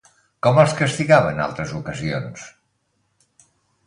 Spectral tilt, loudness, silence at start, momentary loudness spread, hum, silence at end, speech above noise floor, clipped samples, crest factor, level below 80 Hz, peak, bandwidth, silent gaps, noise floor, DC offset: -6 dB/octave; -19 LUFS; 0.45 s; 13 LU; none; 1.35 s; 50 dB; under 0.1%; 20 dB; -52 dBFS; 0 dBFS; 11 kHz; none; -69 dBFS; under 0.1%